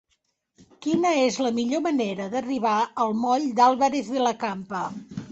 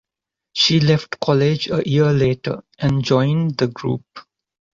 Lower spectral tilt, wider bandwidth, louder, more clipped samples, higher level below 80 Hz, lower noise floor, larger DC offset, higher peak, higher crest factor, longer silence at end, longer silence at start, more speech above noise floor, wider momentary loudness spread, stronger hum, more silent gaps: second, -4.5 dB/octave vs -6 dB/octave; about the same, 8.2 kHz vs 7.6 kHz; second, -24 LUFS vs -18 LUFS; neither; second, -66 dBFS vs -48 dBFS; second, -73 dBFS vs -85 dBFS; neither; second, -8 dBFS vs -2 dBFS; about the same, 16 dB vs 16 dB; second, 0 s vs 0.6 s; first, 0.8 s vs 0.55 s; second, 50 dB vs 67 dB; about the same, 11 LU vs 10 LU; neither; neither